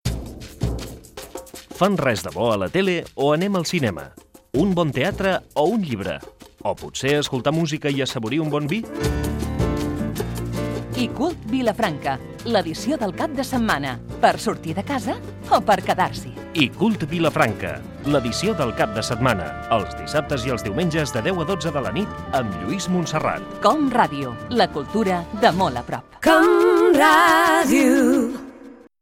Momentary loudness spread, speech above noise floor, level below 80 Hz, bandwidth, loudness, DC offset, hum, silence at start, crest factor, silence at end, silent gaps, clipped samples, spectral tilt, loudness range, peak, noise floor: 13 LU; 23 dB; -40 dBFS; 17 kHz; -21 LUFS; under 0.1%; none; 0.05 s; 18 dB; 0.3 s; none; under 0.1%; -5.5 dB/octave; 7 LU; -2 dBFS; -43 dBFS